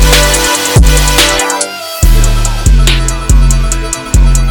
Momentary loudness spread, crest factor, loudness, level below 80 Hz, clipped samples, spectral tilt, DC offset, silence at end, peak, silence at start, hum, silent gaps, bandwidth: 7 LU; 8 dB; -9 LUFS; -10 dBFS; 1%; -3.5 dB/octave; under 0.1%; 0 s; 0 dBFS; 0 s; none; none; over 20 kHz